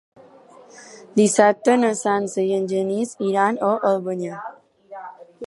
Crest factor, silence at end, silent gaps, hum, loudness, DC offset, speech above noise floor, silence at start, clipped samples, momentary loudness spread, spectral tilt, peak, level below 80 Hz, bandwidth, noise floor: 20 dB; 0 s; none; none; -20 LUFS; under 0.1%; 28 dB; 0.75 s; under 0.1%; 22 LU; -5 dB/octave; -2 dBFS; -74 dBFS; 11.5 kHz; -47 dBFS